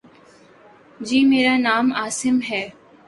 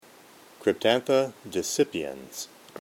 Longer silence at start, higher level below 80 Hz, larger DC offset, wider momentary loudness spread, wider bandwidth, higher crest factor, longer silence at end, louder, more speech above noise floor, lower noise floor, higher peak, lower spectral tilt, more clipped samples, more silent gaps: first, 1 s vs 0.6 s; first, -62 dBFS vs -68 dBFS; neither; second, 12 LU vs 15 LU; second, 11.5 kHz vs 17 kHz; about the same, 16 dB vs 20 dB; first, 0.35 s vs 0 s; first, -19 LUFS vs -27 LUFS; first, 31 dB vs 26 dB; second, -49 dBFS vs -53 dBFS; about the same, -6 dBFS vs -8 dBFS; about the same, -3 dB/octave vs -3.5 dB/octave; neither; neither